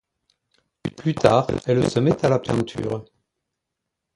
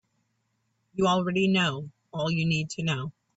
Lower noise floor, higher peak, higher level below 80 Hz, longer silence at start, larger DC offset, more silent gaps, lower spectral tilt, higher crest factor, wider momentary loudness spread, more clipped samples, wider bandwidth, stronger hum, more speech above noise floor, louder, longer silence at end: first, -82 dBFS vs -75 dBFS; first, 0 dBFS vs -14 dBFS; first, -50 dBFS vs -62 dBFS; about the same, 0.85 s vs 0.95 s; neither; neither; first, -7 dB/octave vs -5.5 dB/octave; first, 22 dB vs 14 dB; about the same, 13 LU vs 13 LU; neither; first, 11.5 kHz vs 8 kHz; neither; first, 62 dB vs 49 dB; first, -21 LUFS vs -26 LUFS; first, 1.15 s vs 0.25 s